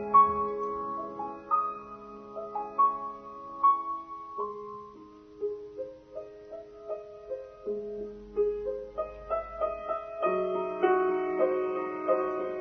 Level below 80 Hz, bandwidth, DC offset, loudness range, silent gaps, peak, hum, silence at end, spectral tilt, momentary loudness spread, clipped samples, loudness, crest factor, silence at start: -60 dBFS; 6.2 kHz; under 0.1%; 11 LU; none; -10 dBFS; none; 0 s; -5 dB/octave; 18 LU; under 0.1%; -31 LUFS; 20 dB; 0 s